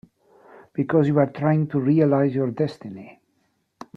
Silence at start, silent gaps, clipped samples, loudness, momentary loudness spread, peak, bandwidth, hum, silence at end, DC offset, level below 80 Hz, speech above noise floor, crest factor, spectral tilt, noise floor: 0.75 s; none; under 0.1%; -21 LUFS; 17 LU; -4 dBFS; 6 kHz; none; 0.85 s; under 0.1%; -64 dBFS; 49 dB; 18 dB; -10 dB/octave; -69 dBFS